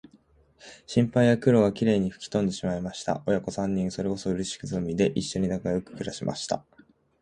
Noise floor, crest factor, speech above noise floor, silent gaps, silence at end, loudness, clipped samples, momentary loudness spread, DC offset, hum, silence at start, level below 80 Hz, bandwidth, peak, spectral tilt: -60 dBFS; 20 dB; 34 dB; none; 0.6 s; -27 LUFS; under 0.1%; 10 LU; under 0.1%; none; 0.65 s; -54 dBFS; 11 kHz; -8 dBFS; -6 dB/octave